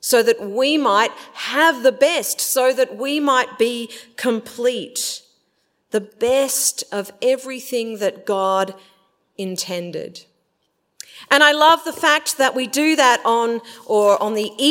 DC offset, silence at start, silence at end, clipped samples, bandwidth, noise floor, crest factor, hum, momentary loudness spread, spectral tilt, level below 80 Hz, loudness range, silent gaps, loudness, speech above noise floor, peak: under 0.1%; 0.05 s; 0 s; under 0.1%; 16.5 kHz; -69 dBFS; 20 dB; none; 13 LU; -2 dB/octave; -70 dBFS; 7 LU; none; -18 LUFS; 51 dB; 0 dBFS